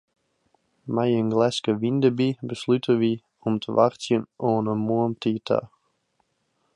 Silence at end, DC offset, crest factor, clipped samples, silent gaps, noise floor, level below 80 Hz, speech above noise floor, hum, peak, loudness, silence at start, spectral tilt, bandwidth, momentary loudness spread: 1.1 s; under 0.1%; 20 dB; under 0.1%; none; -72 dBFS; -66 dBFS; 49 dB; none; -6 dBFS; -24 LUFS; 0.85 s; -7 dB/octave; 10.5 kHz; 6 LU